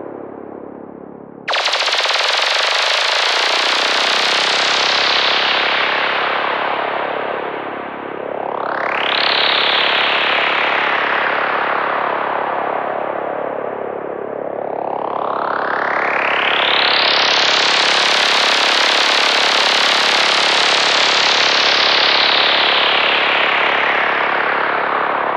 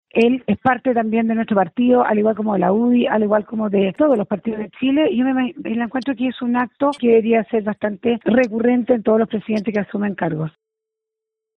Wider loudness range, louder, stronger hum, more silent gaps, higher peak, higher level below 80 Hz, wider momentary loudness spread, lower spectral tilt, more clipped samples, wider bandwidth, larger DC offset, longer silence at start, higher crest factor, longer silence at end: first, 8 LU vs 2 LU; first, -14 LUFS vs -18 LUFS; neither; neither; first, 0 dBFS vs -4 dBFS; second, -64 dBFS vs -58 dBFS; first, 13 LU vs 7 LU; second, -0.5 dB/octave vs -8 dB/octave; neither; first, 15 kHz vs 6.2 kHz; neither; second, 0 s vs 0.15 s; about the same, 16 dB vs 14 dB; second, 0 s vs 1.1 s